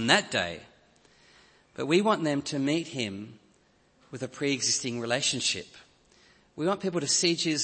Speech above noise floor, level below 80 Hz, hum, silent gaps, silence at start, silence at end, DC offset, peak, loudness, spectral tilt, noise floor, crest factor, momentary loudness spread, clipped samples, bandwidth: 36 dB; -68 dBFS; none; none; 0 s; 0 s; under 0.1%; -4 dBFS; -27 LUFS; -3 dB/octave; -64 dBFS; 26 dB; 19 LU; under 0.1%; 8.8 kHz